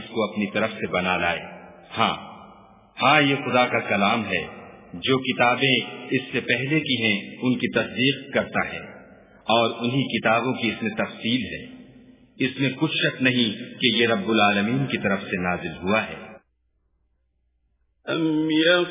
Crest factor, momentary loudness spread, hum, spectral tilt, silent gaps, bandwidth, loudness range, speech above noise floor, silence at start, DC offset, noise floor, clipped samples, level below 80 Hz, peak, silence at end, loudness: 20 dB; 14 LU; none; -9 dB/octave; none; 3.9 kHz; 4 LU; 47 dB; 0 s; under 0.1%; -70 dBFS; under 0.1%; -56 dBFS; -4 dBFS; 0 s; -22 LUFS